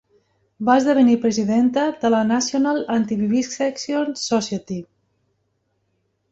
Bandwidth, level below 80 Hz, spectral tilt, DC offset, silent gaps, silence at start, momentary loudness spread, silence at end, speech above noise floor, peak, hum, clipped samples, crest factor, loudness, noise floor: 8 kHz; -62 dBFS; -4.5 dB/octave; under 0.1%; none; 0.6 s; 9 LU; 1.5 s; 51 dB; -2 dBFS; none; under 0.1%; 18 dB; -19 LUFS; -70 dBFS